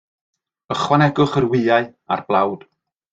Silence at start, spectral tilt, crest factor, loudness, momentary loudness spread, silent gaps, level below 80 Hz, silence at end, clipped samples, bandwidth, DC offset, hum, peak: 0.7 s; -6.5 dB/octave; 18 dB; -18 LUFS; 9 LU; none; -54 dBFS; 0.55 s; under 0.1%; 7.8 kHz; under 0.1%; none; -2 dBFS